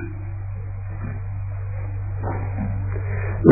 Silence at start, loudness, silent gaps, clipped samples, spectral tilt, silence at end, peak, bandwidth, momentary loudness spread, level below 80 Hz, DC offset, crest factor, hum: 0 s; -27 LUFS; none; under 0.1%; -14.5 dB/octave; 0 s; 0 dBFS; 2.6 kHz; 5 LU; -34 dBFS; under 0.1%; 22 dB; none